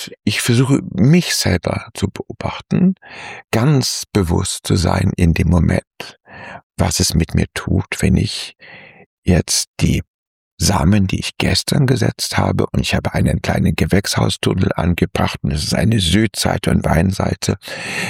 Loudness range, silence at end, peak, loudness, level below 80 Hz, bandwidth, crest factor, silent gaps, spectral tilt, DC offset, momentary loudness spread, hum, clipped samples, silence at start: 2 LU; 0 s; -2 dBFS; -17 LUFS; -32 dBFS; 16.5 kHz; 16 dB; 5.87-5.91 s, 6.63-6.70 s, 9.06-9.23 s, 9.67-9.74 s, 10.08-10.57 s; -5 dB/octave; under 0.1%; 9 LU; none; under 0.1%; 0 s